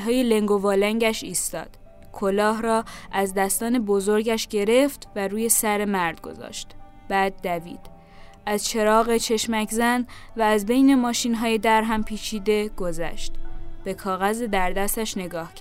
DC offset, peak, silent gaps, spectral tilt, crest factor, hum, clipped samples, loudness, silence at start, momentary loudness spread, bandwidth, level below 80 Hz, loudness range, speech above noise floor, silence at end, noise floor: under 0.1%; -2 dBFS; none; -3.5 dB/octave; 20 dB; none; under 0.1%; -23 LUFS; 0 s; 15 LU; 16 kHz; -38 dBFS; 5 LU; 22 dB; 0 s; -45 dBFS